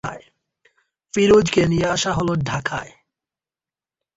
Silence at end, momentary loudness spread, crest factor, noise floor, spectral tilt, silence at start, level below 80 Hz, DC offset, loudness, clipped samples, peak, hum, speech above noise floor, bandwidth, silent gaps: 1.3 s; 15 LU; 18 dB; under -90 dBFS; -5 dB/octave; 0.05 s; -46 dBFS; under 0.1%; -19 LUFS; under 0.1%; -4 dBFS; none; over 72 dB; 8.2 kHz; none